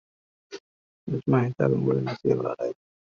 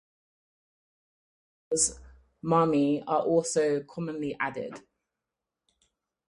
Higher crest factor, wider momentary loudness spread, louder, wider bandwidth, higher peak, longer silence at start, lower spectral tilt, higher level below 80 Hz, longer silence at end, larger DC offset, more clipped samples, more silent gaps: about the same, 18 dB vs 20 dB; first, 21 LU vs 14 LU; about the same, -26 LUFS vs -27 LUFS; second, 7 kHz vs 11.5 kHz; about the same, -8 dBFS vs -10 dBFS; second, 0.5 s vs 1.7 s; first, -8 dB/octave vs -4.5 dB/octave; about the same, -62 dBFS vs -60 dBFS; second, 0.4 s vs 1.5 s; neither; neither; first, 0.60-1.07 s vs none